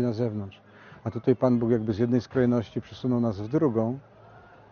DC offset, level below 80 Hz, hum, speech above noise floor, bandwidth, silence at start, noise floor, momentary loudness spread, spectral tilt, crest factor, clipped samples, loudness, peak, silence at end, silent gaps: under 0.1%; -60 dBFS; none; 26 dB; 6.6 kHz; 0 s; -51 dBFS; 13 LU; -8.5 dB/octave; 18 dB; under 0.1%; -26 LUFS; -8 dBFS; 0.35 s; none